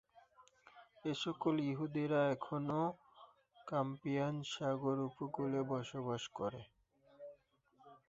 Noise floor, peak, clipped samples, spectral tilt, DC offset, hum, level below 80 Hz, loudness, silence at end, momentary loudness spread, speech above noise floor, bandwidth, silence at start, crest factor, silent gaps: -72 dBFS; -22 dBFS; under 0.1%; -5.5 dB/octave; under 0.1%; none; -78 dBFS; -40 LUFS; 0.1 s; 19 LU; 33 dB; 8 kHz; 0.15 s; 18 dB; none